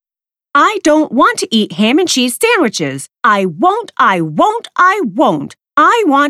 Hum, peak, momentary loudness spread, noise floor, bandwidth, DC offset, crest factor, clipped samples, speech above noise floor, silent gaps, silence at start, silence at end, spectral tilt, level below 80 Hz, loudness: none; 0 dBFS; 5 LU; under -90 dBFS; 15 kHz; under 0.1%; 12 dB; under 0.1%; over 78 dB; none; 0.55 s; 0 s; -3.5 dB/octave; -58 dBFS; -12 LUFS